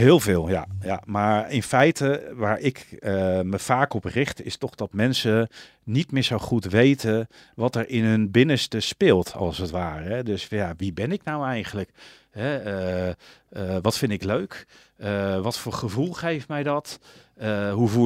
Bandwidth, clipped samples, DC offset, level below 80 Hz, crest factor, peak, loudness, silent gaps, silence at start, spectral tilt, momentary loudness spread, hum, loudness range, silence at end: 16 kHz; under 0.1%; under 0.1%; -52 dBFS; 20 dB; -4 dBFS; -24 LUFS; none; 0 s; -6 dB/octave; 12 LU; none; 7 LU; 0 s